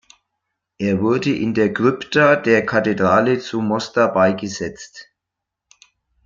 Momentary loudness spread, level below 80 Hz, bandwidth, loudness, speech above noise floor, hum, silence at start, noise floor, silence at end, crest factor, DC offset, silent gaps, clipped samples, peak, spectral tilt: 11 LU; -58 dBFS; 7.6 kHz; -18 LUFS; 65 dB; none; 0.8 s; -82 dBFS; 1.25 s; 18 dB; under 0.1%; none; under 0.1%; -2 dBFS; -6 dB/octave